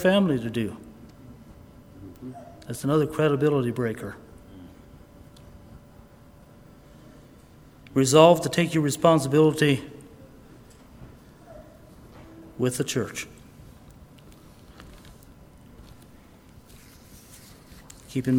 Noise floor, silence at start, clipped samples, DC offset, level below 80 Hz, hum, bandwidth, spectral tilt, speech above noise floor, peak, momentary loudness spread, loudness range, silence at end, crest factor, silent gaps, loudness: -51 dBFS; 0 s; under 0.1%; under 0.1%; -54 dBFS; none; over 20 kHz; -5.5 dB/octave; 29 dB; 0 dBFS; 28 LU; 15 LU; 0 s; 26 dB; none; -23 LUFS